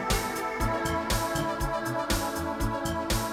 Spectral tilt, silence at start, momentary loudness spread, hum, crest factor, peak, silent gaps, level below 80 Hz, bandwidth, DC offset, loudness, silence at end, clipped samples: -4 dB/octave; 0 s; 3 LU; none; 18 dB; -12 dBFS; none; -36 dBFS; 19 kHz; under 0.1%; -29 LUFS; 0 s; under 0.1%